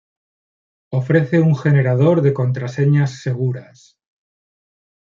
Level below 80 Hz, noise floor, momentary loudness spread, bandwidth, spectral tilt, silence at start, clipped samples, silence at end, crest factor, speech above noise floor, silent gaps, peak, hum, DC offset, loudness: -62 dBFS; under -90 dBFS; 9 LU; 7.2 kHz; -9 dB/octave; 0.9 s; under 0.1%; 1.45 s; 16 dB; over 74 dB; none; -2 dBFS; none; under 0.1%; -17 LUFS